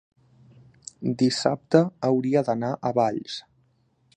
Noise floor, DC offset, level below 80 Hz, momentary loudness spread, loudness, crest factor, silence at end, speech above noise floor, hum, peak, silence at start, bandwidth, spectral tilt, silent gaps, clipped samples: -66 dBFS; under 0.1%; -68 dBFS; 15 LU; -24 LUFS; 22 dB; 0.75 s; 42 dB; none; -4 dBFS; 1 s; 9.8 kHz; -6 dB/octave; none; under 0.1%